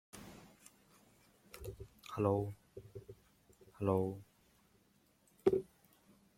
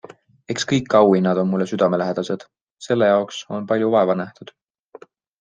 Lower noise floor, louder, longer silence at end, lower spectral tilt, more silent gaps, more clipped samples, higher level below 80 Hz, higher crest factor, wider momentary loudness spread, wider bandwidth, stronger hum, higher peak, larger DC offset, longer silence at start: first, -72 dBFS vs -46 dBFS; second, -38 LUFS vs -19 LUFS; second, 0.75 s vs 0.95 s; first, -8 dB/octave vs -6 dB/octave; second, none vs 2.63-2.77 s; neither; about the same, -68 dBFS vs -64 dBFS; first, 26 dB vs 18 dB; first, 23 LU vs 14 LU; first, 16.5 kHz vs 9.2 kHz; neither; second, -16 dBFS vs -2 dBFS; neither; second, 0.15 s vs 0.5 s